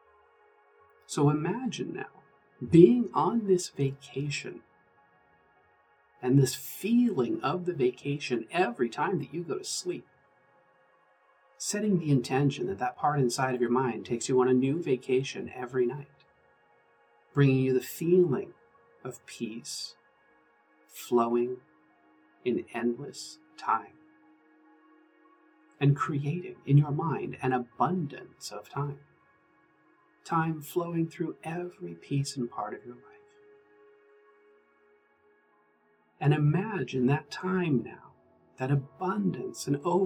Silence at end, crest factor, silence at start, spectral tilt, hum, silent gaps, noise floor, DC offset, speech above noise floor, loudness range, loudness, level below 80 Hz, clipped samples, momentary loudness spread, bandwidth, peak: 0 s; 24 dB; 1.1 s; -6.5 dB/octave; none; none; -68 dBFS; under 0.1%; 39 dB; 9 LU; -29 LUFS; -72 dBFS; under 0.1%; 15 LU; 19 kHz; -6 dBFS